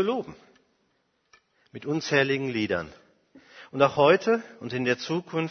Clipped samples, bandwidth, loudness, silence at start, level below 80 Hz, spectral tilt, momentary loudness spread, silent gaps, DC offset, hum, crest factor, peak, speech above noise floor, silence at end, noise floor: under 0.1%; 6.6 kHz; -25 LUFS; 0 s; -66 dBFS; -5.5 dB/octave; 18 LU; none; under 0.1%; none; 22 dB; -6 dBFS; 46 dB; 0 s; -72 dBFS